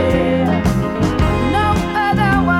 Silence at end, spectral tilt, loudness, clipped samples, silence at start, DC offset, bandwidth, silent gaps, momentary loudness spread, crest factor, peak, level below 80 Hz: 0 s; -7 dB/octave; -16 LUFS; under 0.1%; 0 s; under 0.1%; 15.5 kHz; none; 3 LU; 12 dB; -2 dBFS; -26 dBFS